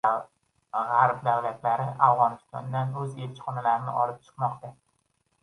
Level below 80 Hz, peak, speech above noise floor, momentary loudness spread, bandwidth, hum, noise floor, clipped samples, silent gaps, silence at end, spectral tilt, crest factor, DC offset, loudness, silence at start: -72 dBFS; -4 dBFS; 47 dB; 12 LU; 11.5 kHz; none; -73 dBFS; under 0.1%; none; 0.7 s; -7.5 dB/octave; 22 dB; under 0.1%; -27 LUFS; 0.05 s